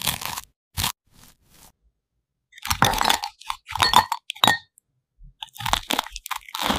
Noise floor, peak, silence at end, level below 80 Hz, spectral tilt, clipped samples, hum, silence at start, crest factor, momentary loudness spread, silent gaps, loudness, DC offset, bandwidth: -78 dBFS; 0 dBFS; 0 s; -44 dBFS; -2 dB/octave; under 0.1%; none; 0 s; 26 dB; 18 LU; 0.56-0.71 s; -23 LUFS; under 0.1%; 16 kHz